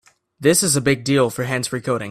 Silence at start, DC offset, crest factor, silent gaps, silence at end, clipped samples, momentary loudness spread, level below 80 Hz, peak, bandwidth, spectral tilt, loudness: 0.4 s; under 0.1%; 18 dB; none; 0 s; under 0.1%; 7 LU; -52 dBFS; -2 dBFS; 16 kHz; -4 dB/octave; -18 LUFS